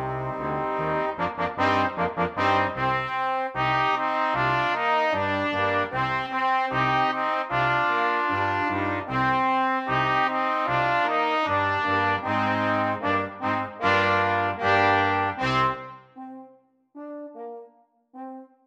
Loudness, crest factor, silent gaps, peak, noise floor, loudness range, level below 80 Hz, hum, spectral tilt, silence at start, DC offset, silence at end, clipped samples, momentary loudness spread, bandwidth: -24 LUFS; 18 dB; none; -8 dBFS; -57 dBFS; 2 LU; -56 dBFS; none; -6 dB/octave; 0 s; under 0.1%; 0.2 s; under 0.1%; 15 LU; 9.6 kHz